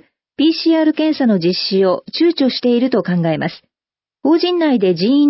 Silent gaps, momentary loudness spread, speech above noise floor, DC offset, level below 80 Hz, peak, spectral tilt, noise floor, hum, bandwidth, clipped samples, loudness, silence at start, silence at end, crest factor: none; 3 LU; over 76 dB; under 0.1%; -64 dBFS; -4 dBFS; -10 dB/octave; under -90 dBFS; none; 5.8 kHz; under 0.1%; -15 LUFS; 0.4 s; 0 s; 12 dB